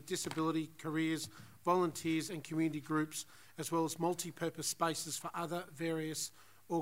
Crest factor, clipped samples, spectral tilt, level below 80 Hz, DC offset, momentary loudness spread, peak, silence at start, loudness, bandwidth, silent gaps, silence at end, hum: 18 dB; under 0.1%; -4 dB/octave; -78 dBFS; under 0.1%; 6 LU; -20 dBFS; 0 s; -38 LUFS; 16 kHz; none; 0 s; none